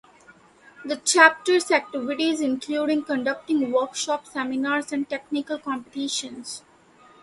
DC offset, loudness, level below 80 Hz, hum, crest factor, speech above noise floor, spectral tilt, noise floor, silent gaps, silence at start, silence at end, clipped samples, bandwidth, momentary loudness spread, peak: under 0.1%; -23 LUFS; -70 dBFS; none; 24 dB; 30 dB; -1.5 dB/octave; -54 dBFS; none; 0.8 s; 0.65 s; under 0.1%; 11.5 kHz; 15 LU; 0 dBFS